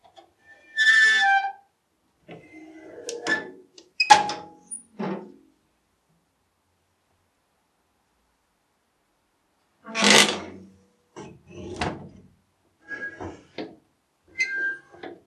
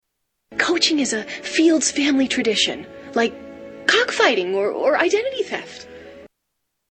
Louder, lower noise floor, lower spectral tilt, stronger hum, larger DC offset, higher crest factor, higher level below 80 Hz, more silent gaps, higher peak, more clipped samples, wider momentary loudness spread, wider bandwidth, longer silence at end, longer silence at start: about the same, -21 LUFS vs -19 LUFS; second, -71 dBFS vs -76 dBFS; about the same, -1.5 dB/octave vs -2 dB/octave; neither; neither; first, 28 dB vs 20 dB; about the same, -60 dBFS vs -60 dBFS; neither; about the same, 0 dBFS vs -2 dBFS; neither; first, 27 LU vs 14 LU; first, 13 kHz vs 8.8 kHz; second, 0.15 s vs 0.65 s; first, 0.75 s vs 0.5 s